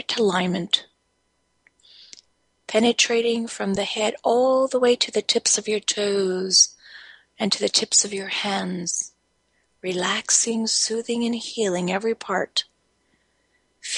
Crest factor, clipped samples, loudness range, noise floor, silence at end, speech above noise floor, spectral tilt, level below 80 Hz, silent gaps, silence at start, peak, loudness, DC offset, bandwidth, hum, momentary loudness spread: 22 dB; under 0.1%; 4 LU; -70 dBFS; 0 s; 47 dB; -2 dB/octave; -68 dBFS; none; 0.1 s; -2 dBFS; -21 LUFS; under 0.1%; 11.5 kHz; none; 8 LU